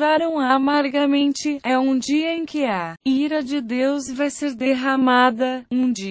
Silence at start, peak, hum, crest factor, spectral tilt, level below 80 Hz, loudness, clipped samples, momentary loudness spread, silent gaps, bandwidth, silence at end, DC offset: 0 s; -6 dBFS; none; 14 dB; -4 dB/octave; -62 dBFS; -20 LUFS; under 0.1%; 7 LU; none; 8 kHz; 0 s; under 0.1%